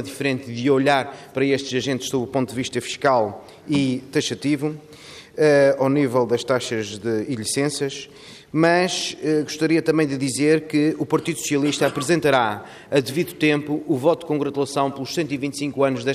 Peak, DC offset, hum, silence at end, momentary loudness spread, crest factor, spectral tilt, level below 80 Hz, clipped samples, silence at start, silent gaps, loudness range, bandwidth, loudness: -4 dBFS; under 0.1%; none; 0 s; 8 LU; 16 dB; -5 dB/octave; -62 dBFS; under 0.1%; 0 s; none; 2 LU; 15.5 kHz; -21 LUFS